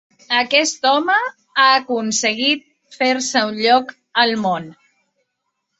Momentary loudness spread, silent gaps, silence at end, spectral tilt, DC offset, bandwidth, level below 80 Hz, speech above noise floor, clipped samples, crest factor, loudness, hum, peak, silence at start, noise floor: 8 LU; none; 1.05 s; -2 dB/octave; under 0.1%; 8.2 kHz; -68 dBFS; 58 dB; under 0.1%; 18 dB; -17 LUFS; none; -2 dBFS; 0.3 s; -75 dBFS